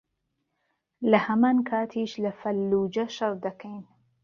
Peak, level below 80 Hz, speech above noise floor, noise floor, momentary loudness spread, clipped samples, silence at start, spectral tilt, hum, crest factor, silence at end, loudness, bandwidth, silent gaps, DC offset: -4 dBFS; -68 dBFS; 53 dB; -78 dBFS; 13 LU; under 0.1%; 1 s; -6.5 dB/octave; none; 22 dB; 0.4 s; -26 LUFS; 7 kHz; none; under 0.1%